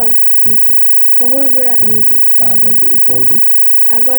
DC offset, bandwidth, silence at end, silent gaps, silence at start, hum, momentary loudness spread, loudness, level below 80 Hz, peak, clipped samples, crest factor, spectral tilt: under 0.1%; over 20 kHz; 0 s; none; 0 s; none; 1 LU; -4 LUFS; -42 dBFS; -2 dBFS; under 0.1%; 6 dB; -8 dB/octave